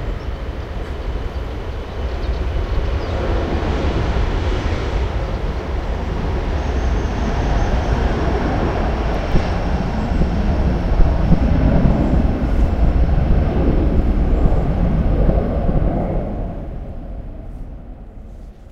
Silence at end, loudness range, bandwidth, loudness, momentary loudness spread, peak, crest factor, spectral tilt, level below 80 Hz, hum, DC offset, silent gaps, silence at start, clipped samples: 0 s; 6 LU; 7.2 kHz; -20 LUFS; 13 LU; 0 dBFS; 18 dB; -8 dB/octave; -20 dBFS; none; under 0.1%; none; 0 s; under 0.1%